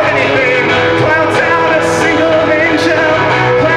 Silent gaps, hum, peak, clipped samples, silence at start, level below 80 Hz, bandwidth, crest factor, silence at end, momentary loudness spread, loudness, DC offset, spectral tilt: none; none; 0 dBFS; under 0.1%; 0 s; -40 dBFS; 13 kHz; 10 dB; 0 s; 1 LU; -10 LUFS; under 0.1%; -5 dB/octave